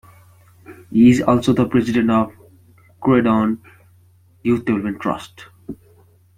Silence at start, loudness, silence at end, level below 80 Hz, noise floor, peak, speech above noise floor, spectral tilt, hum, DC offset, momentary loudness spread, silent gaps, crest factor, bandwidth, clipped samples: 0.7 s; -18 LUFS; 0.65 s; -50 dBFS; -52 dBFS; -2 dBFS; 36 dB; -7.5 dB/octave; none; under 0.1%; 23 LU; none; 16 dB; 11 kHz; under 0.1%